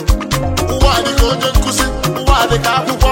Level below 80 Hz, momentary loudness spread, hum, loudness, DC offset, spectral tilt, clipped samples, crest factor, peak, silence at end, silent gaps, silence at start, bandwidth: -16 dBFS; 4 LU; none; -14 LUFS; under 0.1%; -4 dB/octave; under 0.1%; 12 dB; 0 dBFS; 0 s; none; 0 s; 16.5 kHz